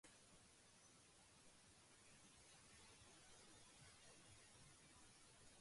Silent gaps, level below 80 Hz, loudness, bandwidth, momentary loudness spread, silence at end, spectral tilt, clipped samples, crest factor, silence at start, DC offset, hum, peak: none; -82 dBFS; -67 LUFS; 11.5 kHz; 3 LU; 0 s; -2 dB/octave; under 0.1%; 14 dB; 0.05 s; under 0.1%; none; -54 dBFS